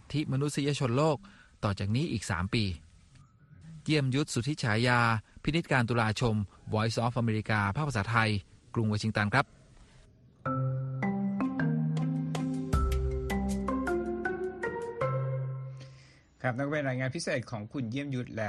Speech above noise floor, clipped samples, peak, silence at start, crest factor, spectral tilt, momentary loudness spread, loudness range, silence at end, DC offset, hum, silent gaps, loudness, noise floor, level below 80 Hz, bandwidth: 28 dB; under 0.1%; -10 dBFS; 0.1 s; 22 dB; -6 dB/octave; 8 LU; 5 LU; 0 s; under 0.1%; none; none; -31 LUFS; -58 dBFS; -44 dBFS; 12 kHz